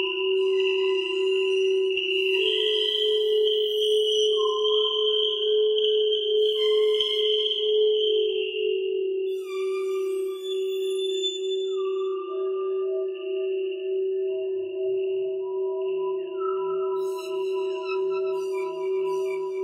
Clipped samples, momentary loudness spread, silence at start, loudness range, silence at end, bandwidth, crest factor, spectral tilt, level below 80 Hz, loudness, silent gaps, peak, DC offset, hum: under 0.1%; 7 LU; 0 s; 6 LU; 0 s; 12.5 kHz; 14 dB; -2 dB/octave; -76 dBFS; -25 LUFS; none; -10 dBFS; under 0.1%; none